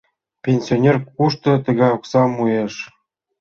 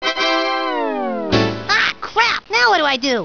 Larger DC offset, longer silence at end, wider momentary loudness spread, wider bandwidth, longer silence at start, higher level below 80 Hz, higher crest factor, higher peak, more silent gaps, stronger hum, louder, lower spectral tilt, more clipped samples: second, under 0.1% vs 0.7%; first, 0.55 s vs 0 s; first, 11 LU vs 7 LU; first, 7 kHz vs 5.4 kHz; first, 0.45 s vs 0 s; second, -56 dBFS vs -46 dBFS; about the same, 16 dB vs 18 dB; about the same, -2 dBFS vs 0 dBFS; neither; neither; about the same, -18 LUFS vs -16 LUFS; first, -7.5 dB/octave vs -3.5 dB/octave; neither